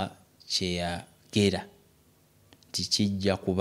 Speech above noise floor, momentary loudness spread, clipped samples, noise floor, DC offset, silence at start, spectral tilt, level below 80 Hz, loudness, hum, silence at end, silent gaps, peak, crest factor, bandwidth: 35 dB; 11 LU; under 0.1%; -62 dBFS; under 0.1%; 0 s; -4.5 dB/octave; -58 dBFS; -29 LUFS; none; 0 s; none; -10 dBFS; 22 dB; 15.5 kHz